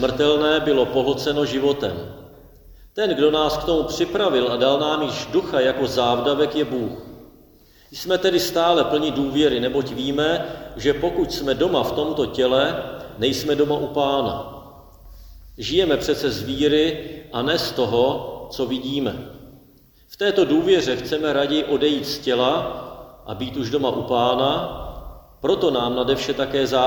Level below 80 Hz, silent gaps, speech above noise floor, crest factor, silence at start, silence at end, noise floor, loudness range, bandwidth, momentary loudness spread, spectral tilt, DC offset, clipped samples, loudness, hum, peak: -46 dBFS; none; 32 dB; 18 dB; 0 s; 0 s; -52 dBFS; 3 LU; 19.5 kHz; 13 LU; -5 dB/octave; under 0.1%; under 0.1%; -21 LUFS; none; -4 dBFS